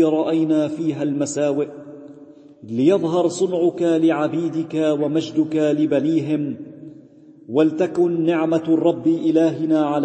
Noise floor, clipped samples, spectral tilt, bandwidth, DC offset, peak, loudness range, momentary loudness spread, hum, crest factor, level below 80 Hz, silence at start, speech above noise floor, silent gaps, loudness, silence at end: -46 dBFS; under 0.1%; -6.5 dB/octave; 8.8 kHz; under 0.1%; -4 dBFS; 2 LU; 8 LU; none; 14 dB; -70 dBFS; 0 s; 27 dB; none; -20 LUFS; 0 s